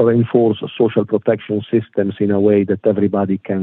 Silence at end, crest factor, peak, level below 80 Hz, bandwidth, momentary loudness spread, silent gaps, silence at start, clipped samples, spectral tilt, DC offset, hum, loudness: 0 s; 14 dB; -2 dBFS; -60 dBFS; 4 kHz; 5 LU; none; 0 s; under 0.1%; -11 dB/octave; under 0.1%; none; -17 LUFS